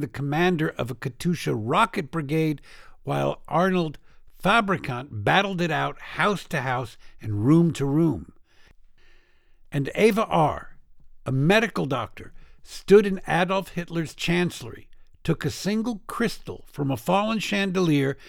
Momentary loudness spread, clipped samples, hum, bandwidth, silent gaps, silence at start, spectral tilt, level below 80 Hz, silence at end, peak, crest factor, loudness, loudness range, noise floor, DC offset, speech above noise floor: 12 LU; under 0.1%; none; 17 kHz; none; 0 s; -6 dB/octave; -48 dBFS; 0 s; -4 dBFS; 20 dB; -24 LUFS; 4 LU; -54 dBFS; under 0.1%; 30 dB